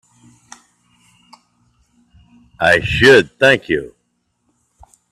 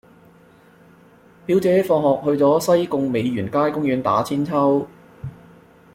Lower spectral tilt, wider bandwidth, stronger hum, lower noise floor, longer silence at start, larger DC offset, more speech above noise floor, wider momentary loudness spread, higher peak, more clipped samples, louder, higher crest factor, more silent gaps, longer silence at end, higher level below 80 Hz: second, -4.5 dB/octave vs -6.5 dB/octave; second, 13.5 kHz vs 16.5 kHz; neither; first, -68 dBFS vs -50 dBFS; first, 2.6 s vs 1.5 s; neither; first, 55 dB vs 32 dB; second, 12 LU vs 19 LU; first, 0 dBFS vs -4 dBFS; neither; first, -13 LUFS vs -19 LUFS; about the same, 18 dB vs 16 dB; neither; first, 1.25 s vs 0.6 s; first, -44 dBFS vs -58 dBFS